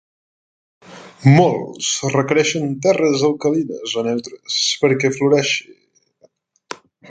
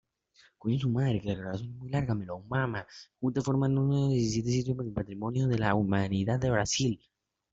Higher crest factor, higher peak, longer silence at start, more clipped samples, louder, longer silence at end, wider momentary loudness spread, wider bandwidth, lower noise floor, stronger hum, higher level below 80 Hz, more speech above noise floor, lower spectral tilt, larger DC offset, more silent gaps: about the same, 18 dB vs 20 dB; first, 0 dBFS vs -10 dBFS; first, 0.9 s vs 0.65 s; neither; first, -17 LUFS vs -30 LUFS; second, 0 s vs 0.55 s; about the same, 10 LU vs 8 LU; first, 9.4 kHz vs 7.8 kHz; second, -56 dBFS vs -64 dBFS; neither; about the same, -60 dBFS vs -56 dBFS; first, 40 dB vs 35 dB; second, -4.5 dB/octave vs -6 dB/octave; neither; neither